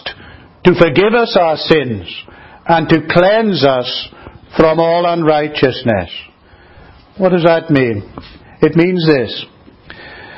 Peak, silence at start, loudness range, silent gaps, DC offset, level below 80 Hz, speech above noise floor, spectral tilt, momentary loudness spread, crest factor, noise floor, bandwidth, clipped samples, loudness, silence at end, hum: 0 dBFS; 0.05 s; 3 LU; none; under 0.1%; -42 dBFS; 31 dB; -8 dB/octave; 17 LU; 14 dB; -43 dBFS; 7.8 kHz; 0.2%; -13 LUFS; 0 s; none